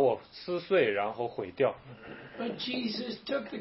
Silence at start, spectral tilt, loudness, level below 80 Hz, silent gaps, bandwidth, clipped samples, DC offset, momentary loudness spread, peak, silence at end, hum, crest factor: 0 s; -8.5 dB/octave; -32 LUFS; -70 dBFS; none; 6 kHz; under 0.1%; under 0.1%; 17 LU; -14 dBFS; 0 s; none; 18 dB